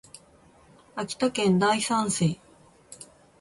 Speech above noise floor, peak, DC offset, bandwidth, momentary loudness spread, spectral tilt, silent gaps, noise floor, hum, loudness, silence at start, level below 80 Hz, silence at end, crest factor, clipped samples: 32 dB; -12 dBFS; under 0.1%; 11.5 kHz; 23 LU; -4.5 dB/octave; none; -56 dBFS; none; -25 LUFS; 0.95 s; -62 dBFS; 0.35 s; 16 dB; under 0.1%